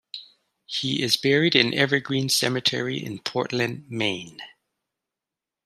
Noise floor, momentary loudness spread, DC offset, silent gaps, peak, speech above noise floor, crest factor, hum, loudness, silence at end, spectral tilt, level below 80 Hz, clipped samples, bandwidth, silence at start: -88 dBFS; 14 LU; under 0.1%; none; -2 dBFS; 64 dB; 24 dB; none; -23 LUFS; 1.15 s; -3.5 dB/octave; -68 dBFS; under 0.1%; 14.5 kHz; 0.15 s